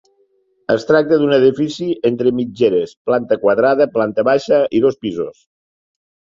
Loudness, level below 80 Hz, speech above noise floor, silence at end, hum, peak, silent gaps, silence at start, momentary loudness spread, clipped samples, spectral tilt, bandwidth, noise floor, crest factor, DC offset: -16 LUFS; -56 dBFS; 45 dB; 1.05 s; none; -2 dBFS; 2.97-3.05 s; 0.7 s; 8 LU; under 0.1%; -6.5 dB/octave; 7.6 kHz; -60 dBFS; 14 dB; under 0.1%